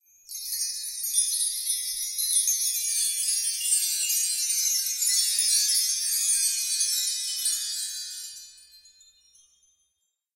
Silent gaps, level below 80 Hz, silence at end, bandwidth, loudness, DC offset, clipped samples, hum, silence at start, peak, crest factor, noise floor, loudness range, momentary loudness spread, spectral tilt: none; -74 dBFS; 1.6 s; 16 kHz; -23 LUFS; under 0.1%; under 0.1%; none; 0.3 s; -10 dBFS; 18 dB; -77 dBFS; 6 LU; 10 LU; 7.5 dB/octave